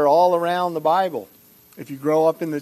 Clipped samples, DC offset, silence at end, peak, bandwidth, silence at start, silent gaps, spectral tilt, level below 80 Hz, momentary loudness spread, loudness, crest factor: under 0.1%; under 0.1%; 0 s; -6 dBFS; 13.5 kHz; 0 s; none; -6 dB/octave; -72 dBFS; 17 LU; -20 LUFS; 14 dB